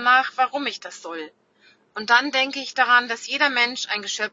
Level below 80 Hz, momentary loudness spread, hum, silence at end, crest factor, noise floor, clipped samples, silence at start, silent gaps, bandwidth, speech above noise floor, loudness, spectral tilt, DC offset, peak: -80 dBFS; 17 LU; none; 0.05 s; 20 dB; -58 dBFS; under 0.1%; 0 s; none; 8 kHz; 35 dB; -20 LUFS; -0.5 dB/octave; under 0.1%; -2 dBFS